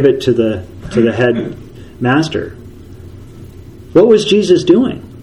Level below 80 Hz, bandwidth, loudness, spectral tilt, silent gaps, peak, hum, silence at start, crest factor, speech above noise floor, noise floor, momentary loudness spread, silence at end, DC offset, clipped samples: -42 dBFS; 11.5 kHz; -13 LUFS; -6 dB/octave; none; 0 dBFS; none; 0 s; 14 dB; 22 dB; -33 dBFS; 14 LU; 0 s; under 0.1%; 0.2%